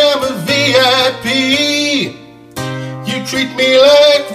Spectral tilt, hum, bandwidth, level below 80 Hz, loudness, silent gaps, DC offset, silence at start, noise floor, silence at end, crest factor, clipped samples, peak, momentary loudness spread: -3.5 dB/octave; none; 15.5 kHz; -50 dBFS; -11 LUFS; none; under 0.1%; 0 s; -32 dBFS; 0 s; 12 dB; under 0.1%; 0 dBFS; 15 LU